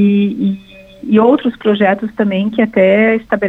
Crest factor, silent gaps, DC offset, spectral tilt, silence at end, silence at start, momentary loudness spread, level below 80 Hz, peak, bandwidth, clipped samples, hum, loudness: 12 dB; none; under 0.1%; -9 dB/octave; 0 s; 0 s; 8 LU; -50 dBFS; 0 dBFS; 4 kHz; under 0.1%; none; -13 LUFS